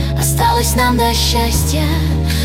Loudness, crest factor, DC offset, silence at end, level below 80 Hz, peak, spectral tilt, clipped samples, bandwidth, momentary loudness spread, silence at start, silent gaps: -14 LUFS; 12 dB; under 0.1%; 0 s; -20 dBFS; -2 dBFS; -4 dB/octave; under 0.1%; 17 kHz; 3 LU; 0 s; none